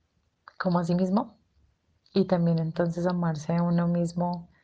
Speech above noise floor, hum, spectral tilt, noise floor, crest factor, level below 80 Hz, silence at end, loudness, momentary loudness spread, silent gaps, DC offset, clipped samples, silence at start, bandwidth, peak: 41 dB; none; -8 dB/octave; -67 dBFS; 16 dB; -60 dBFS; 0.2 s; -27 LUFS; 6 LU; none; under 0.1%; under 0.1%; 0.6 s; 8 kHz; -10 dBFS